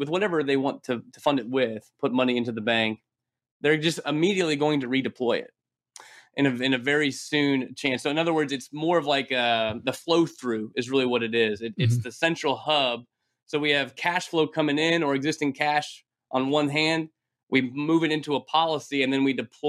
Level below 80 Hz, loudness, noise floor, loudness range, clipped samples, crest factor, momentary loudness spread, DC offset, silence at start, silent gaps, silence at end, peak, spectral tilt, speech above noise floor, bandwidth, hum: -72 dBFS; -25 LUFS; -52 dBFS; 1 LU; under 0.1%; 16 dB; 6 LU; under 0.1%; 0 s; 3.51-3.60 s, 17.43-17.47 s; 0 s; -8 dBFS; -5 dB/octave; 27 dB; 13.5 kHz; none